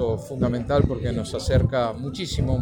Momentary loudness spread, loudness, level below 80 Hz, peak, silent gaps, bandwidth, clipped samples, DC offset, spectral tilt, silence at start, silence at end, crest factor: 6 LU; -24 LUFS; -34 dBFS; -6 dBFS; none; 18.5 kHz; under 0.1%; under 0.1%; -7 dB/octave; 0 s; 0 s; 18 dB